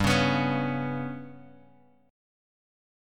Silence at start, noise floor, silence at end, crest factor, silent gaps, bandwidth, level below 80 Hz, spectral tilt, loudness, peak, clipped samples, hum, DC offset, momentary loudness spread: 0 s; -59 dBFS; 1.65 s; 20 dB; none; 15.5 kHz; -52 dBFS; -5.5 dB/octave; -28 LUFS; -12 dBFS; under 0.1%; none; under 0.1%; 18 LU